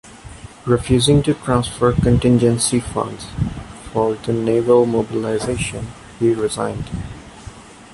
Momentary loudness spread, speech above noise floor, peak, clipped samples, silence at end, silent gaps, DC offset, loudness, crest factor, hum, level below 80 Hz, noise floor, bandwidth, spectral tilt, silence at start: 19 LU; 21 dB; -2 dBFS; under 0.1%; 0.1 s; none; under 0.1%; -18 LUFS; 16 dB; none; -36 dBFS; -38 dBFS; 11.5 kHz; -5.5 dB/octave; 0.05 s